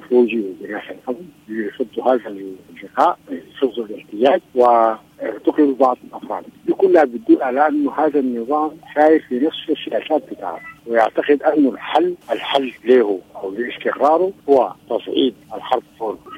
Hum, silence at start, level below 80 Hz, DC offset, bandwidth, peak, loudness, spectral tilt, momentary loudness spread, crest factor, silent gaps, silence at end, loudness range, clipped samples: none; 0 s; -64 dBFS; under 0.1%; 11 kHz; 0 dBFS; -18 LUFS; -6 dB/octave; 15 LU; 18 dB; none; 0 s; 4 LU; under 0.1%